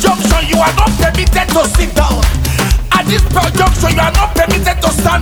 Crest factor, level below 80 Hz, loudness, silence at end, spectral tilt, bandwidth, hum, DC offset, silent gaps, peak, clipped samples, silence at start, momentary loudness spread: 10 dB; -14 dBFS; -11 LUFS; 0 s; -4.5 dB/octave; over 20 kHz; none; under 0.1%; none; 0 dBFS; under 0.1%; 0 s; 2 LU